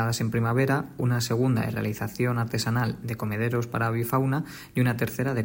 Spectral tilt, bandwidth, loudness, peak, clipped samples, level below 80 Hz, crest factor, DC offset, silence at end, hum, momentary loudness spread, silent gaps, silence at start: -6 dB/octave; 16.5 kHz; -27 LUFS; -12 dBFS; under 0.1%; -56 dBFS; 14 dB; under 0.1%; 0 s; none; 5 LU; none; 0 s